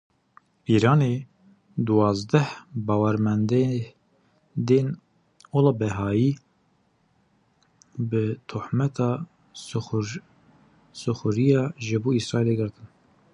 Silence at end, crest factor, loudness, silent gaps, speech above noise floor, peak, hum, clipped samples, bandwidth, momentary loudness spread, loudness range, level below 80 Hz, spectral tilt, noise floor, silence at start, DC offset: 0.5 s; 20 dB; -24 LUFS; none; 43 dB; -4 dBFS; none; under 0.1%; 10.5 kHz; 15 LU; 6 LU; -56 dBFS; -7.5 dB/octave; -66 dBFS; 0.7 s; under 0.1%